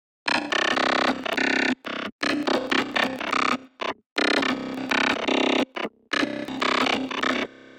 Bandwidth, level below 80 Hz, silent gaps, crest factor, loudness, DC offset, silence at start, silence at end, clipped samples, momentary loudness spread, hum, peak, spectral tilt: 17 kHz; -62 dBFS; 2.12-2.19 s, 4.06-4.16 s; 18 dB; -24 LUFS; under 0.1%; 0.25 s; 0 s; under 0.1%; 7 LU; none; -6 dBFS; -3 dB/octave